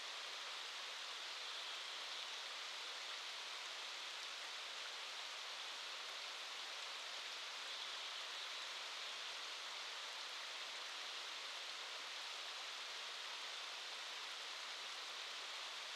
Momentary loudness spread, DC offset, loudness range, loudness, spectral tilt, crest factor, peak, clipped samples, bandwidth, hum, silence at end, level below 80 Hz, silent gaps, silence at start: 1 LU; under 0.1%; 1 LU; -46 LUFS; 3.5 dB/octave; 18 dB; -32 dBFS; under 0.1%; 16 kHz; none; 0 s; under -90 dBFS; none; 0 s